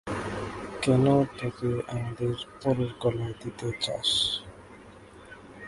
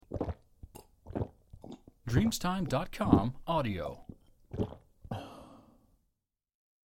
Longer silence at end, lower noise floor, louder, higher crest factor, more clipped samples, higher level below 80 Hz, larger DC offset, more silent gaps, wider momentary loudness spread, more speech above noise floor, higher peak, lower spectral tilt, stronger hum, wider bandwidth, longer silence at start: second, 0 s vs 1.3 s; second, -49 dBFS vs -85 dBFS; first, -28 LUFS vs -34 LUFS; second, 18 dB vs 28 dB; neither; about the same, -52 dBFS vs -50 dBFS; neither; neither; second, 15 LU vs 26 LU; second, 22 dB vs 54 dB; second, -10 dBFS vs -6 dBFS; about the same, -5.5 dB/octave vs -6.5 dB/octave; neither; second, 11.5 kHz vs 16.5 kHz; about the same, 0.05 s vs 0.1 s